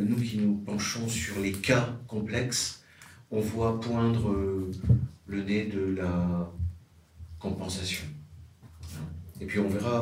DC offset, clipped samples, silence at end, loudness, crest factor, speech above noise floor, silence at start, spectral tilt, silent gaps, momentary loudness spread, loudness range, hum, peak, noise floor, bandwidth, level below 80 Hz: under 0.1%; under 0.1%; 0 s; -30 LUFS; 20 dB; 24 dB; 0 s; -5.5 dB/octave; none; 14 LU; 6 LU; none; -10 dBFS; -52 dBFS; 16 kHz; -48 dBFS